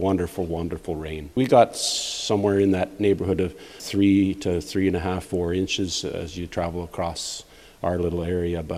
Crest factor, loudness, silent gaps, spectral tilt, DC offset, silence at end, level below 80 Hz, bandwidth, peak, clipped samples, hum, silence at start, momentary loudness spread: 20 dB; -24 LUFS; none; -5 dB/octave; under 0.1%; 0 s; -44 dBFS; 15.5 kHz; -2 dBFS; under 0.1%; none; 0 s; 12 LU